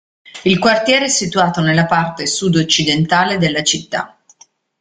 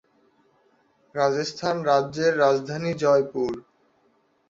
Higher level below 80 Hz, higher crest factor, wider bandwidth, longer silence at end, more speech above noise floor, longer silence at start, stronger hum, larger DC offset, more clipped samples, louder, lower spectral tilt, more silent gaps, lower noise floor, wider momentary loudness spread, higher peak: first, -50 dBFS vs -66 dBFS; about the same, 16 dB vs 18 dB; first, 9.6 kHz vs 7.8 kHz; second, 0.75 s vs 0.9 s; second, 35 dB vs 43 dB; second, 0.25 s vs 1.15 s; neither; neither; neither; first, -14 LUFS vs -23 LUFS; second, -3.5 dB/octave vs -5.5 dB/octave; neither; second, -50 dBFS vs -65 dBFS; about the same, 7 LU vs 8 LU; first, 0 dBFS vs -6 dBFS